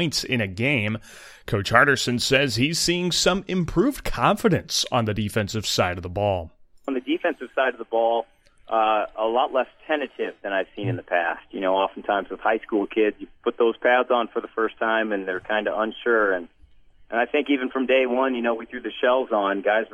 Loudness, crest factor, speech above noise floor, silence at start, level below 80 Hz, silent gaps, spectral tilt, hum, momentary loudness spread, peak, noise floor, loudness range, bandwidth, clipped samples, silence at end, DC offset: -23 LUFS; 22 dB; 28 dB; 0 s; -48 dBFS; none; -4.5 dB/octave; none; 9 LU; 0 dBFS; -51 dBFS; 4 LU; 16 kHz; under 0.1%; 0.05 s; under 0.1%